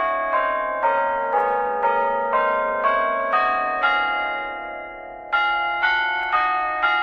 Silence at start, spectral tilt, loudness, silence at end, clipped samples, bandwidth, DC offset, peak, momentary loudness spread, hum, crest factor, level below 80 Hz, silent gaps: 0 s; -4 dB/octave; -21 LUFS; 0 s; under 0.1%; 7 kHz; under 0.1%; -8 dBFS; 7 LU; none; 14 dB; -54 dBFS; none